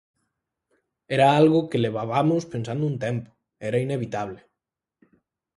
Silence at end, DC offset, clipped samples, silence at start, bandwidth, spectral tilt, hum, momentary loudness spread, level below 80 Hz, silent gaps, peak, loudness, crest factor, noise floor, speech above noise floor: 1.25 s; under 0.1%; under 0.1%; 1.1 s; 11.5 kHz; -7 dB/octave; none; 13 LU; -62 dBFS; none; -4 dBFS; -23 LUFS; 20 dB; -86 dBFS; 64 dB